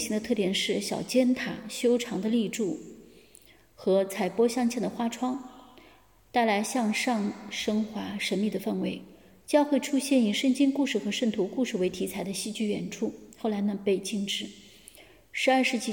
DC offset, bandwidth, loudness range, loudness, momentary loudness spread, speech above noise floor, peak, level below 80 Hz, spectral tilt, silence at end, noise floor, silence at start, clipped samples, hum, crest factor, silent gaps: under 0.1%; 17.5 kHz; 3 LU; -28 LUFS; 9 LU; 31 dB; -10 dBFS; -66 dBFS; -4.5 dB/octave; 0 s; -58 dBFS; 0 s; under 0.1%; none; 18 dB; none